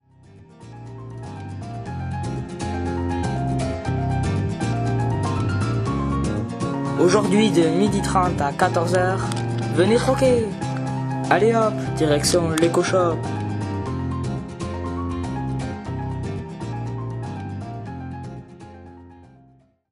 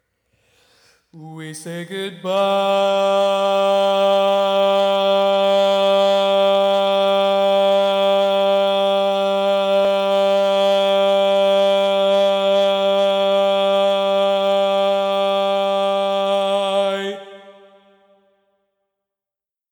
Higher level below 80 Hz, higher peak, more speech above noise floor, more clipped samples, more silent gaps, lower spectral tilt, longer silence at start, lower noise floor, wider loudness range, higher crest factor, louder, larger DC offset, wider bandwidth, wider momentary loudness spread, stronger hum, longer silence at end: first, -40 dBFS vs -76 dBFS; first, -2 dBFS vs -8 dBFS; second, 37 dB vs 69 dB; neither; neither; first, -6 dB/octave vs -4.5 dB/octave; second, 0.3 s vs 1.15 s; second, -55 dBFS vs -89 dBFS; first, 10 LU vs 5 LU; first, 22 dB vs 10 dB; second, -22 LUFS vs -17 LUFS; neither; second, 13 kHz vs 19 kHz; first, 15 LU vs 4 LU; neither; second, 0.65 s vs 2.2 s